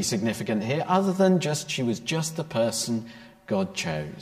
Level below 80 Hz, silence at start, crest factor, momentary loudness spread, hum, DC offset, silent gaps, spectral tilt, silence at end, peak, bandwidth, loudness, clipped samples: -60 dBFS; 0 s; 18 dB; 9 LU; none; under 0.1%; none; -5 dB/octave; 0 s; -8 dBFS; 15.5 kHz; -26 LUFS; under 0.1%